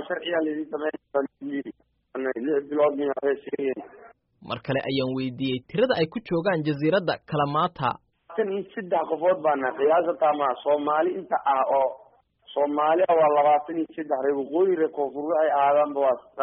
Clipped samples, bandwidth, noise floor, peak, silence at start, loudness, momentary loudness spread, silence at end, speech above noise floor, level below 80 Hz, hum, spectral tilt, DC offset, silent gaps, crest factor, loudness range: under 0.1%; 5.4 kHz; -55 dBFS; -8 dBFS; 0 s; -25 LUFS; 10 LU; 0 s; 31 dB; -66 dBFS; none; -4.5 dB/octave; under 0.1%; none; 16 dB; 5 LU